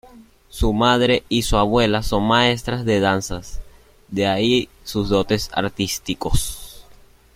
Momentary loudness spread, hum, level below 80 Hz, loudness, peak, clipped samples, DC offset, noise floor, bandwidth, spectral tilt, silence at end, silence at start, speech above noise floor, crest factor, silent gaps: 13 LU; none; -32 dBFS; -20 LUFS; -2 dBFS; under 0.1%; under 0.1%; -48 dBFS; 16.5 kHz; -4.5 dB/octave; 0.6 s; 0.15 s; 29 dB; 18 dB; none